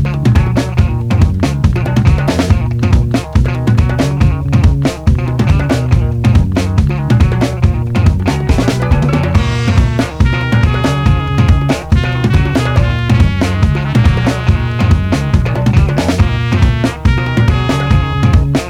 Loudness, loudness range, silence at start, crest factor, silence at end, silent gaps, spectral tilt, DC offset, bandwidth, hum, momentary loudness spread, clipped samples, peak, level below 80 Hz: -12 LUFS; 0 LU; 0 s; 10 dB; 0 s; none; -7 dB/octave; under 0.1%; 13 kHz; none; 2 LU; 0.2%; 0 dBFS; -18 dBFS